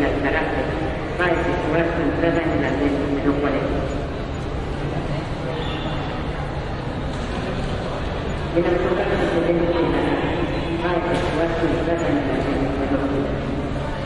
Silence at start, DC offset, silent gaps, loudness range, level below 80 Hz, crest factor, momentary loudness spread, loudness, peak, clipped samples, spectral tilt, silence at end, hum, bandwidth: 0 s; under 0.1%; none; 5 LU; -32 dBFS; 16 dB; 7 LU; -22 LUFS; -4 dBFS; under 0.1%; -7 dB/octave; 0 s; none; 11 kHz